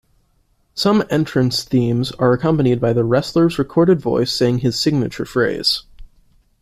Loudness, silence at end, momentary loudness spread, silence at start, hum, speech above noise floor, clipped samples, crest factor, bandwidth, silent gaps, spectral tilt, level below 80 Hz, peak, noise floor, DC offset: -17 LUFS; 0.55 s; 4 LU; 0.75 s; none; 44 dB; under 0.1%; 14 dB; 15 kHz; none; -6 dB/octave; -46 dBFS; -2 dBFS; -61 dBFS; under 0.1%